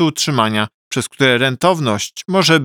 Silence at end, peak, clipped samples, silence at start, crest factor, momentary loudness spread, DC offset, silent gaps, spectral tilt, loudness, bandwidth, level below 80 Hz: 0 s; 0 dBFS; under 0.1%; 0 s; 14 dB; 8 LU; under 0.1%; 0.74-0.91 s; -4 dB/octave; -16 LUFS; 20 kHz; -58 dBFS